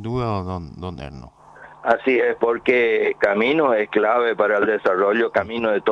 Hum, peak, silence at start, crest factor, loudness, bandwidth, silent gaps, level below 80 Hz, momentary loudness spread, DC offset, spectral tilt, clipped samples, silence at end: none; -4 dBFS; 0 s; 16 dB; -19 LUFS; 7.6 kHz; none; -50 dBFS; 13 LU; under 0.1%; -7 dB/octave; under 0.1%; 0 s